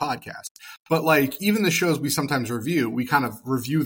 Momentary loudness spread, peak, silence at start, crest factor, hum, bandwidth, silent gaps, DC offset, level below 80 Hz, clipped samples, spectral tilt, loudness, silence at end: 15 LU; -6 dBFS; 0 s; 18 dB; none; 17 kHz; 0.51-0.55 s, 0.77-0.85 s; under 0.1%; -62 dBFS; under 0.1%; -4.5 dB/octave; -23 LUFS; 0 s